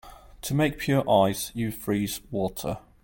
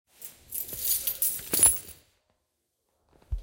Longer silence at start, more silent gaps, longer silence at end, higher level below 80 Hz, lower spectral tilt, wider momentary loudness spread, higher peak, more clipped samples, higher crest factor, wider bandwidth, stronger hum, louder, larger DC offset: second, 0.05 s vs 0.2 s; neither; first, 0.25 s vs 0 s; about the same, -50 dBFS vs -46 dBFS; first, -5.5 dB/octave vs -1 dB/octave; second, 10 LU vs 22 LU; about the same, -8 dBFS vs -6 dBFS; neither; second, 18 dB vs 24 dB; about the same, 17 kHz vs 17.5 kHz; neither; about the same, -26 LUFS vs -24 LUFS; neither